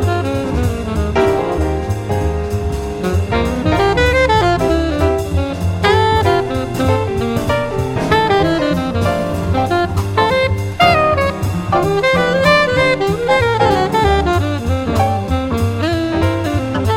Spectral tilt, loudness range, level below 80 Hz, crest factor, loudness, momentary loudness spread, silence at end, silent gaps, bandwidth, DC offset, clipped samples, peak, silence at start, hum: -6 dB/octave; 3 LU; -26 dBFS; 14 dB; -15 LUFS; 6 LU; 0 s; none; 16 kHz; under 0.1%; under 0.1%; 0 dBFS; 0 s; none